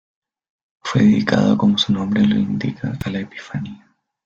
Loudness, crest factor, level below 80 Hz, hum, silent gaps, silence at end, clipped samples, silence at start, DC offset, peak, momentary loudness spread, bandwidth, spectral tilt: -18 LUFS; 18 dB; -52 dBFS; none; none; 0.5 s; under 0.1%; 0.85 s; under 0.1%; -2 dBFS; 14 LU; 7.6 kHz; -6.5 dB/octave